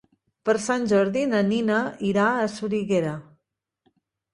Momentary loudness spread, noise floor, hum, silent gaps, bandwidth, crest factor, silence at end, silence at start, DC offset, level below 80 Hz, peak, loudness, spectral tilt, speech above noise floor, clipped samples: 6 LU; -78 dBFS; none; none; 11 kHz; 16 dB; 1.1 s; 0.45 s; under 0.1%; -64 dBFS; -8 dBFS; -23 LUFS; -5.5 dB/octave; 56 dB; under 0.1%